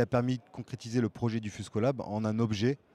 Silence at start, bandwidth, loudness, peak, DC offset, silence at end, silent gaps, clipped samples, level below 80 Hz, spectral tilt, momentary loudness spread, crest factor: 0 s; 11 kHz; -32 LUFS; -14 dBFS; under 0.1%; 0.2 s; none; under 0.1%; -64 dBFS; -7 dB/octave; 8 LU; 16 dB